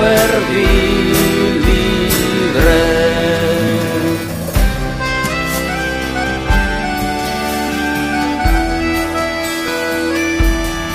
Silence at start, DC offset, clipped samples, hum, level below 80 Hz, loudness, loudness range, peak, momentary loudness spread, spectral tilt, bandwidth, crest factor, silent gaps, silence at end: 0 s; under 0.1%; under 0.1%; none; -22 dBFS; -15 LUFS; 4 LU; 0 dBFS; 6 LU; -4.5 dB/octave; 15.5 kHz; 14 dB; none; 0 s